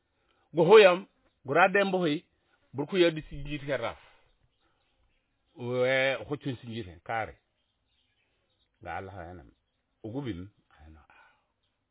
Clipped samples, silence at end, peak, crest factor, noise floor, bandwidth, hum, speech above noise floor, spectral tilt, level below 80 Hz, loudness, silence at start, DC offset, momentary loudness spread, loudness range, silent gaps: under 0.1%; 1.45 s; -6 dBFS; 24 dB; -77 dBFS; 4 kHz; none; 51 dB; -3.5 dB/octave; -58 dBFS; -26 LUFS; 0.55 s; under 0.1%; 22 LU; 19 LU; none